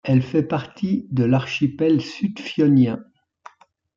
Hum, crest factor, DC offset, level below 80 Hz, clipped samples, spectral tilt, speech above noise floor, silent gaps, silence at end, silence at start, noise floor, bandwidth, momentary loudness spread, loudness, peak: none; 14 dB; under 0.1%; -60 dBFS; under 0.1%; -8 dB/octave; 29 dB; none; 0.95 s; 0.05 s; -48 dBFS; 7.4 kHz; 9 LU; -21 LUFS; -6 dBFS